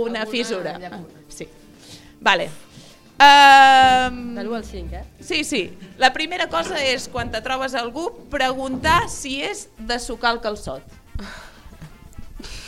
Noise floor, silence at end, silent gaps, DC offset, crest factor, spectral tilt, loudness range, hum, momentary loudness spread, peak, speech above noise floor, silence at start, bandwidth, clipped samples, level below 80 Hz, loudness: -44 dBFS; 0 s; none; under 0.1%; 20 dB; -2.5 dB/octave; 11 LU; none; 25 LU; 0 dBFS; 25 dB; 0 s; 15.5 kHz; under 0.1%; -42 dBFS; -17 LUFS